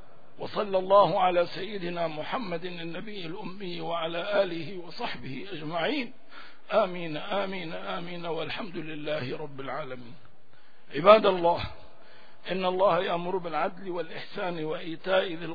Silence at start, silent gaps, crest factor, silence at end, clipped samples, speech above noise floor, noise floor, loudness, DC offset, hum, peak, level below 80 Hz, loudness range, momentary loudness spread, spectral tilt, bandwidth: 0.4 s; none; 26 dB; 0 s; under 0.1%; 31 dB; -60 dBFS; -29 LUFS; 1%; none; -2 dBFS; -60 dBFS; 8 LU; 16 LU; -7.5 dB/octave; 5 kHz